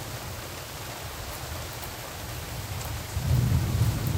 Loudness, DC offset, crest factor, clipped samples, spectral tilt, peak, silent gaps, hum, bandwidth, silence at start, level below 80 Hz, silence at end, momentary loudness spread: -31 LUFS; under 0.1%; 20 dB; under 0.1%; -5 dB/octave; -10 dBFS; none; none; 18 kHz; 0 s; -40 dBFS; 0 s; 11 LU